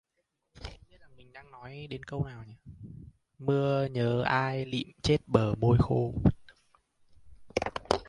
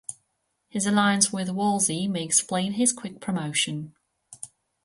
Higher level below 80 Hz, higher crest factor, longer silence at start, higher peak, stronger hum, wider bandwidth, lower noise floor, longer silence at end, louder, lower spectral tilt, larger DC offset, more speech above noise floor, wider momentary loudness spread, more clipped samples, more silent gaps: first, -48 dBFS vs -68 dBFS; about the same, 26 dB vs 22 dB; first, 0.6 s vs 0.1 s; about the same, -6 dBFS vs -4 dBFS; neither; about the same, 11 kHz vs 12 kHz; first, -80 dBFS vs -75 dBFS; second, 0.05 s vs 0.4 s; second, -29 LUFS vs -24 LUFS; first, -7 dB/octave vs -3 dB/octave; neither; about the same, 51 dB vs 50 dB; about the same, 22 LU vs 20 LU; neither; neither